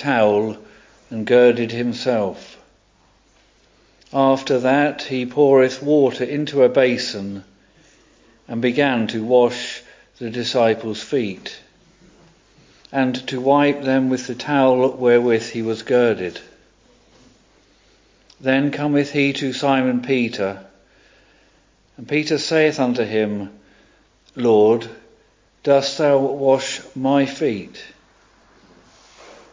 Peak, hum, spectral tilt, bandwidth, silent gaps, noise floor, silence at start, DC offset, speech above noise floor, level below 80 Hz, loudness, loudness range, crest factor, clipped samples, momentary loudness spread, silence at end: -2 dBFS; none; -5.5 dB/octave; 7.6 kHz; none; -57 dBFS; 0 s; under 0.1%; 39 dB; -60 dBFS; -19 LUFS; 5 LU; 18 dB; under 0.1%; 15 LU; 0.2 s